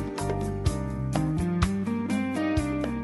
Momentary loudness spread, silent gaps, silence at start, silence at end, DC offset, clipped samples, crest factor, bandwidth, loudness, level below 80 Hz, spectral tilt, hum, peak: 3 LU; none; 0 s; 0 s; under 0.1%; under 0.1%; 18 dB; 11.5 kHz; -28 LUFS; -38 dBFS; -6.5 dB/octave; none; -8 dBFS